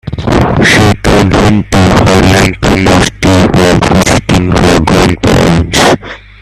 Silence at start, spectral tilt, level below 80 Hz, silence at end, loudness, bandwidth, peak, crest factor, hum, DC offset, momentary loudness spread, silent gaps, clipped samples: 0.05 s; -5 dB/octave; -20 dBFS; 0.25 s; -7 LUFS; 15 kHz; 0 dBFS; 6 dB; none; under 0.1%; 3 LU; none; 0.3%